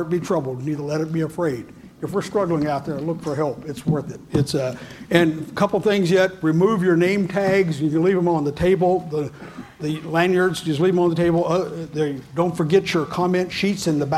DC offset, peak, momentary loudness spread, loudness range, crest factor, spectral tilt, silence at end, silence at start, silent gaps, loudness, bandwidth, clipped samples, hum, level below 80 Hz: under 0.1%; 0 dBFS; 9 LU; 5 LU; 20 dB; -6.5 dB/octave; 0 s; 0 s; none; -21 LUFS; 14.5 kHz; under 0.1%; none; -50 dBFS